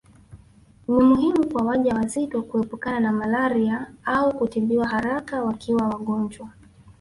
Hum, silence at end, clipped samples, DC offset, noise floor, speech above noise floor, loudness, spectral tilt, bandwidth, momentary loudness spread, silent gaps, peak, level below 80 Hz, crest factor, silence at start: none; 0.1 s; under 0.1%; under 0.1%; -52 dBFS; 30 dB; -23 LUFS; -6.5 dB/octave; 11.5 kHz; 8 LU; none; -6 dBFS; -52 dBFS; 16 dB; 0.3 s